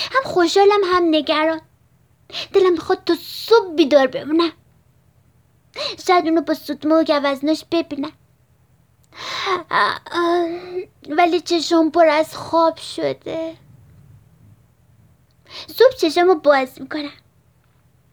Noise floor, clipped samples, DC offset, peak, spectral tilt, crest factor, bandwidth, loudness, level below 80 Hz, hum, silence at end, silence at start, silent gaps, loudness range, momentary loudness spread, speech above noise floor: -57 dBFS; under 0.1%; under 0.1%; -2 dBFS; -4 dB/octave; 18 dB; over 20 kHz; -18 LUFS; -60 dBFS; none; 1 s; 0 s; none; 5 LU; 14 LU; 39 dB